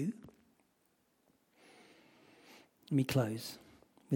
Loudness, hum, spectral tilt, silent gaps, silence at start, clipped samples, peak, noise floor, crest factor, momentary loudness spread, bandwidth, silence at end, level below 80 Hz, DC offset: -36 LUFS; none; -6.5 dB/octave; none; 0 s; under 0.1%; -20 dBFS; -76 dBFS; 20 dB; 27 LU; 17.5 kHz; 0 s; -72 dBFS; under 0.1%